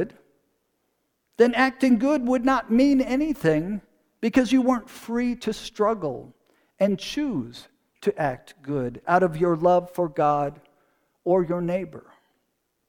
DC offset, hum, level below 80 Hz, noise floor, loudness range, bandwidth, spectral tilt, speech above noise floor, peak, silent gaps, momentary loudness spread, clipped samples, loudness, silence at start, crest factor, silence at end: under 0.1%; none; -54 dBFS; -74 dBFS; 6 LU; 18 kHz; -6.5 dB/octave; 52 dB; -6 dBFS; none; 12 LU; under 0.1%; -23 LUFS; 0 s; 20 dB; 0.9 s